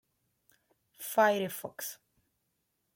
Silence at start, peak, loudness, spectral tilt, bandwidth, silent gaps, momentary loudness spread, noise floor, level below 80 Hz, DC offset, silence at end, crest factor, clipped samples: 1 s; -14 dBFS; -31 LUFS; -3.5 dB/octave; 17 kHz; none; 17 LU; -80 dBFS; -84 dBFS; under 0.1%; 1 s; 22 dB; under 0.1%